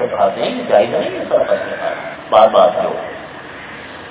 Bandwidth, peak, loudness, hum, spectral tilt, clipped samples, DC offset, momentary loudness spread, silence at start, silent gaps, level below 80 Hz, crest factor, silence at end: 4 kHz; 0 dBFS; -15 LUFS; none; -8.5 dB/octave; under 0.1%; under 0.1%; 20 LU; 0 s; none; -52 dBFS; 16 dB; 0 s